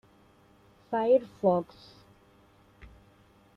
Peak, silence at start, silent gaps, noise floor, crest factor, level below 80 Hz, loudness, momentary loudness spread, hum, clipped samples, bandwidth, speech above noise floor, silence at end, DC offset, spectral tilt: -12 dBFS; 0.9 s; none; -61 dBFS; 20 dB; -64 dBFS; -27 LUFS; 10 LU; none; under 0.1%; 6 kHz; 34 dB; 1.95 s; under 0.1%; -8.5 dB/octave